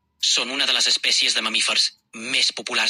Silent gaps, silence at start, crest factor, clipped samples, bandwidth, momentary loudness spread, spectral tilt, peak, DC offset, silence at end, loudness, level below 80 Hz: none; 0.2 s; 16 dB; under 0.1%; 16 kHz; 5 LU; 1.5 dB/octave; -6 dBFS; under 0.1%; 0 s; -18 LUFS; -78 dBFS